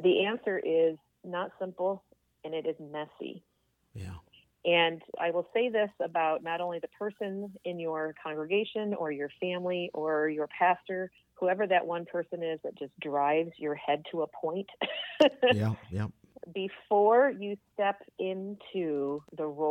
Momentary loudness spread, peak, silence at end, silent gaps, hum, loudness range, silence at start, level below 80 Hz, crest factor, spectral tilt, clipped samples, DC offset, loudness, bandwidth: 13 LU; -8 dBFS; 0 s; none; none; 6 LU; 0 s; -70 dBFS; 22 dB; -7 dB/octave; under 0.1%; under 0.1%; -31 LUFS; 8.8 kHz